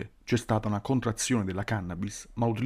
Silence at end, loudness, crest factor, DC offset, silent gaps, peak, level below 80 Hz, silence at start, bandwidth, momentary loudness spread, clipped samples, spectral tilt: 0 s; -30 LUFS; 16 dB; under 0.1%; none; -14 dBFS; -52 dBFS; 0 s; 15.5 kHz; 7 LU; under 0.1%; -5.5 dB/octave